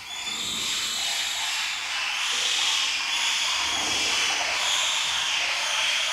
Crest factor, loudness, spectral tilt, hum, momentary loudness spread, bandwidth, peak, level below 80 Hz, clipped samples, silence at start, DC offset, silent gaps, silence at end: 14 dB; -23 LUFS; 2 dB/octave; none; 4 LU; 16 kHz; -12 dBFS; -62 dBFS; under 0.1%; 0 s; under 0.1%; none; 0 s